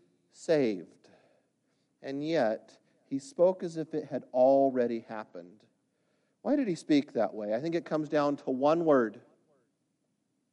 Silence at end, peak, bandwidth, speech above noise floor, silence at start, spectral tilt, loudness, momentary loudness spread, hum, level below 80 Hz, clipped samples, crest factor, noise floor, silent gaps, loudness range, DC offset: 1.35 s; -14 dBFS; 10.5 kHz; 49 dB; 0.4 s; -6.5 dB/octave; -30 LUFS; 15 LU; none; -82 dBFS; under 0.1%; 18 dB; -78 dBFS; none; 4 LU; under 0.1%